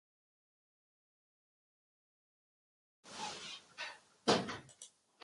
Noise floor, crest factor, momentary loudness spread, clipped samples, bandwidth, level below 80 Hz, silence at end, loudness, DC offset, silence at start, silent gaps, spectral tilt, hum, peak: -61 dBFS; 30 dB; 22 LU; under 0.1%; 11.5 kHz; -78 dBFS; 0.35 s; -40 LUFS; under 0.1%; 3.05 s; none; -3.5 dB/octave; none; -14 dBFS